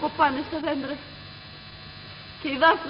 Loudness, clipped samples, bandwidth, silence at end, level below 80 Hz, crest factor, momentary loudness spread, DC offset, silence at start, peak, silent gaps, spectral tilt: -26 LUFS; under 0.1%; 5.6 kHz; 0 s; -56 dBFS; 20 dB; 20 LU; under 0.1%; 0 s; -6 dBFS; none; -1.5 dB/octave